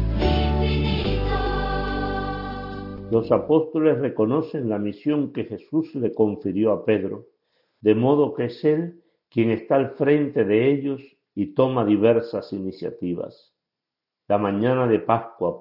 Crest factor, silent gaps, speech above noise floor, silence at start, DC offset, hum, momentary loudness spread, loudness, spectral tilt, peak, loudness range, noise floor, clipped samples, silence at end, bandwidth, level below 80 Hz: 18 dB; none; 64 dB; 0 s; under 0.1%; none; 11 LU; -23 LUFS; -9.5 dB/octave; -4 dBFS; 3 LU; -86 dBFS; under 0.1%; 0 s; 5.8 kHz; -36 dBFS